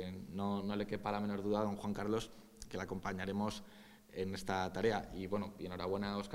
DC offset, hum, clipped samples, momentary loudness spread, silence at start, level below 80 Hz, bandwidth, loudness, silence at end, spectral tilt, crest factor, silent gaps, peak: under 0.1%; none; under 0.1%; 11 LU; 0 s; -60 dBFS; 16 kHz; -40 LUFS; 0 s; -6 dB/octave; 18 dB; none; -20 dBFS